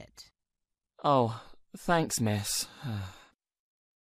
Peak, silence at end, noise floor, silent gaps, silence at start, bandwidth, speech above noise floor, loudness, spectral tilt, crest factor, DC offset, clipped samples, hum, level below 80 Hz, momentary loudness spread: -14 dBFS; 0.85 s; -87 dBFS; none; 0 s; 15.5 kHz; 57 dB; -30 LUFS; -4.5 dB/octave; 20 dB; under 0.1%; under 0.1%; none; -60 dBFS; 19 LU